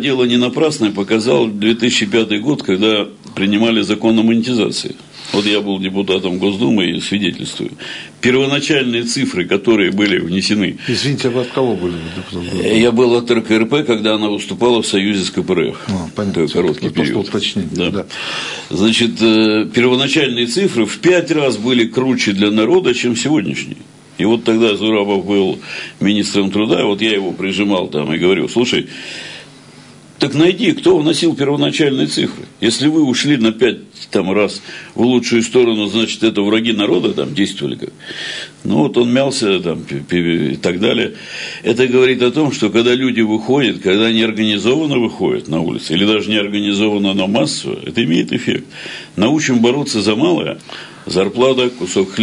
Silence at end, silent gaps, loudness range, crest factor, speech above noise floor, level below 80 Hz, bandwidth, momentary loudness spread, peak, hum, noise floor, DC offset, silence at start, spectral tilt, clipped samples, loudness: 0 s; none; 3 LU; 14 dB; 25 dB; -54 dBFS; 11 kHz; 9 LU; -2 dBFS; none; -40 dBFS; under 0.1%; 0 s; -4.5 dB/octave; under 0.1%; -15 LUFS